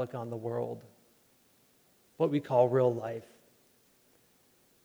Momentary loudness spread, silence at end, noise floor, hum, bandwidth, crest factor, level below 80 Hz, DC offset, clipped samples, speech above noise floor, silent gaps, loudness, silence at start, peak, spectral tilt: 14 LU; 1.6 s; -67 dBFS; none; over 20 kHz; 22 dB; -82 dBFS; under 0.1%; under 0.1%; 36 dB; none; -31 LUFS; 0 s; -12 dBFS; -8.5 dB/octave